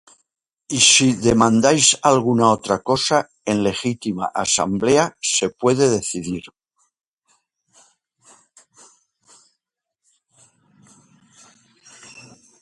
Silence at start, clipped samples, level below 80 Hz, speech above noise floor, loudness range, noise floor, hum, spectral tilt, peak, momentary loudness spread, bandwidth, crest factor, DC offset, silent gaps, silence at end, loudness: 0.7 s; under 0.1%; -52 dBFS; 63 dB; 10 LU; -81 dBFS; none; -3 dB/octave; 0 dBFS; 11 LU; 11.5 kHz; 20 dB; under 0.1%; 7.07-7.18 s; 0.4 s; -17 LUFS